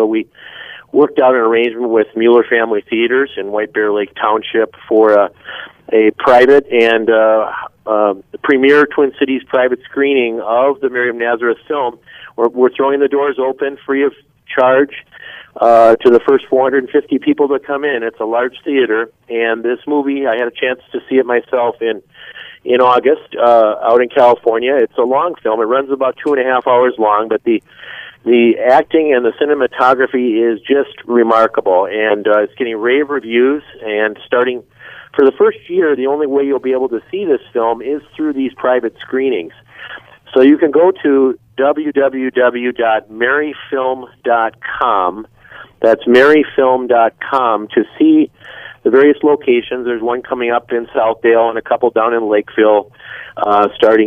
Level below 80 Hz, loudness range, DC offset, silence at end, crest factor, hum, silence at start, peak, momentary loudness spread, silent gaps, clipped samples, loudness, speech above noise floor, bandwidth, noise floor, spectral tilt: -58 dBFS; 4 LU; under 0.1%; 0 s; 12 dB; none; 0 s; 0 dBFS; 10 LU; none; under 0.1%; -13 LUFS; 21 dB; 6 kHz; -33 dBFS; -6.5 dB/octave